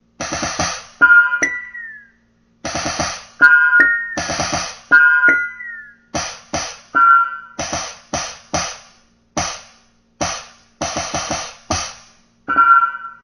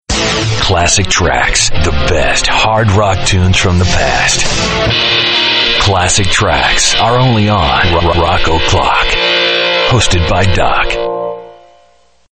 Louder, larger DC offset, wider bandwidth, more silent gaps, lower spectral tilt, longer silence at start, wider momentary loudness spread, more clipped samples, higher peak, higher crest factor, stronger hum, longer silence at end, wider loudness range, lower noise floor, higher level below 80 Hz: second, -16 LUFS vs -10 LUFS; neither; first, 11.5 kHz vs 9.2 kHz; neither; second, -1.5 dB/octave vs -3 dB/octave; about the same, 0.2 s vs 0.1 s; first, 18 LU vs 3 LU; neither; about the same, 0 dBFS vs 0 dBFS; first, 18 dB vs 10 dB; neither; second, 0.1 s vs 0.8 s; first, 11 LU vs 2 LU; first, -58 dBFS vs -49 dBFS; second, -46 dBFS vs -22 dBFS